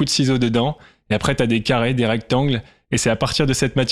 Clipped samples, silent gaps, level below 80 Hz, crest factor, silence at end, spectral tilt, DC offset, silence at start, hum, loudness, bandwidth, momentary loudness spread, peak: under 0.1%; none; -42 dBFS; 14 dB; 0 s; -5 dB/octave; under 0.1%; 0 s; none; -19 LUFS; 14.5 kHz; 7 LU; -6 dBFS